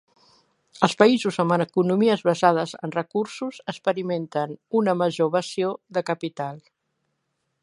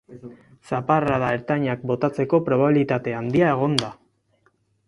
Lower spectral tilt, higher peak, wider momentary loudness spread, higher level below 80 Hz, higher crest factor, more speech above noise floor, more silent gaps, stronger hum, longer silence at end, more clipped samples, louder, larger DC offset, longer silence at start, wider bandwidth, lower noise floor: about the same, -6 dB/octave vs -6.5 dB/octave; about the same, 0 dBFS vs -2 dBFS; about the same, 11 LU vs 9 LU; second, -72 dBFS vs -56 dBFS; about the same, 24 dB vs 22 dB; first, 53 dB vs 44 dB; neither; neither; about the same, 1.05 s vs 0.95 s; neither; about the same, -23 LUFS vs -22 LUFS; neither; first, 0.75 s vs 0.1 s; about the same, 11.5 kHz vs 11.5 kHz; first, -76 dBFS vs -65 dBFS